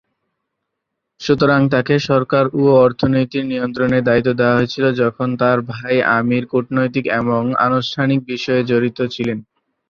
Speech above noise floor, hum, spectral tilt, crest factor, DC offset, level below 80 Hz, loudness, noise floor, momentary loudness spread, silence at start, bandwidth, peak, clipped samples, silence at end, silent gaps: 61 dB; none; -7 dB/octave; 14 dB; under 0.1%; -52 dBFS; -16 LUFS; -77 dBFS; 7 LU; 1.2 s; 7 kHz; -2 dBFS; under 0.1%; 0.45 s; none